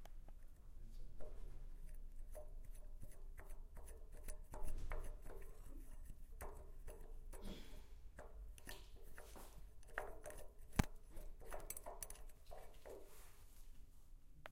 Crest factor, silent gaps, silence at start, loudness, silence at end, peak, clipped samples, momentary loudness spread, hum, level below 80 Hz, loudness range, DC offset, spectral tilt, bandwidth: 36 dB; none; 0 s; -56 LUFS; 0 s; -14 dBFS; under 0.1%; 12 LU; none; -52 dBFS; 9 LU; under 0.1%; -4.5 dB/octave; 16 kHz